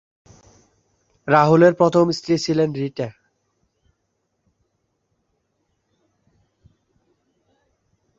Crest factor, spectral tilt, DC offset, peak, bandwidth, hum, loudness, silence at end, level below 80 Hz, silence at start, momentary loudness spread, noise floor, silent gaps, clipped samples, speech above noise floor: 22 dB; -6.5 dB/octave; under 0.1%; -2 dBFS; 7.8 kHz; none; -18 LUFS; 5.1 s; -62 dBFS; 1.25 s; 16 LU; -73 dBFS; none; under 0.1%; 56 dB